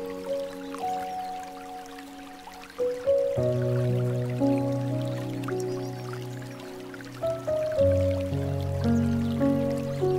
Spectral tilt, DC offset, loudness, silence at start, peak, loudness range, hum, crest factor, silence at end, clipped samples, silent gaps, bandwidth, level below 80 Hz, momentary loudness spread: -7.5 dB/octave; under 0.1%; -28 LUFS; 0 s; -12 dBFS; 5 LU; none; 16 dB; 0 s; under 0.1%; none; 16 kHz; -52 dBFS; 15 LU